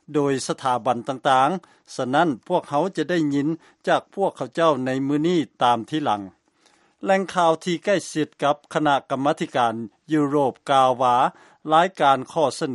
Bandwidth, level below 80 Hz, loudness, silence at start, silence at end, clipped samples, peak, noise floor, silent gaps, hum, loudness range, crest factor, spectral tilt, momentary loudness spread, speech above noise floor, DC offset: 11.5 kHz; -70 dBFS; -22 LUFS; 0.1 s; 0 s; under 0.1%; -4 dBFS; -60 dBFS; none; none; 3 LU; 18 dB; -5.5 dB/octave; 7 LU; 39 dB; under 0.1%